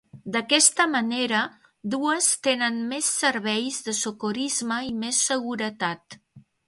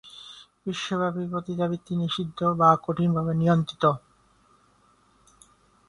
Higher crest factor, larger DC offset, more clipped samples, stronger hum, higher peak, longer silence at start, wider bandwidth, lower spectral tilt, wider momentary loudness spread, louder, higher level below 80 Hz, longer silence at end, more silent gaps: about the same, 22 dB vs 22 dB; neither; neither; second, none vs 50 Hz at -60 dBFS; about the same, -4 dBFS vs -6 dBFS; about the same, 0.15 s vs 0.05 s; about the same, 12 kHz vs 11 kHz; second, -1.5 dB/octave vs -7 dB/octave; second, 12 LU vs 15 LU; about the same, -23 LUFS vs -25 LUFS; second, -68 dBFS vs -60 dBFS; second, 0.25 s vs 1.9 s; neither